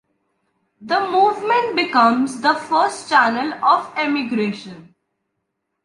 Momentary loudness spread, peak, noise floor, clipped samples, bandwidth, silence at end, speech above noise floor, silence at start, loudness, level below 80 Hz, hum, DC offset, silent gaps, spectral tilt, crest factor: 7 LU; -2 dBFS; -75 dBFS; under 0.1%; 11.5 kHz; 1 s; 58 dB; 0.8 s; -18 LUFS; -68 dBFS; none; under 0.1%; none; -4 dB/octave; 18 dB